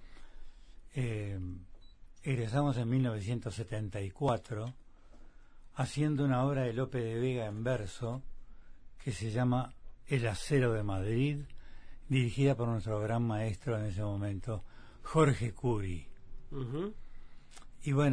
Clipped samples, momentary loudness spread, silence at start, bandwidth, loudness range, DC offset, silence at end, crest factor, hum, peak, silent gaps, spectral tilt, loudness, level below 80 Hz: under 0.1%; 13 LU; 0 s; 10.5 kHz; 3 LU; under 0.1%; 0 s; 20 dB; none; -14 dBFS; none; -7 dB/octave; -34 LUFS; -50 dBFS